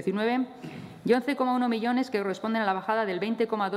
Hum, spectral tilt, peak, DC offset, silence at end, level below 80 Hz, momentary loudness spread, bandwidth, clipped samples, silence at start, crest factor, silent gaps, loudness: none; -6.5 dB/octave; -12 dBFS; under 0.1%; 0 s; -74 dBFS; 8 LU; 13.5 kHz; under 0.1%; 0 s; 16 dB; none; -28 LUFS